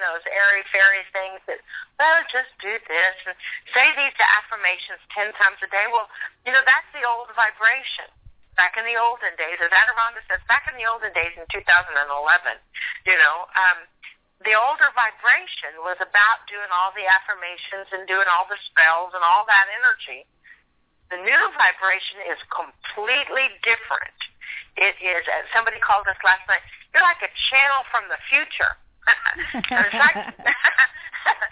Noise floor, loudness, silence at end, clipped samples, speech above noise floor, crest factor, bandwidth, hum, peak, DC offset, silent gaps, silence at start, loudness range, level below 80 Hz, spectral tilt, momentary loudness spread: -63 dBFS; -19 LUFS; 0 s; under 0.1%; 43 dB; 18 dB; 4 kHz; none; -4 dBFS; under 0.1%; none; 0 s; 2 LU; -58 dBFS; 2.5 dB/octave; 14 LU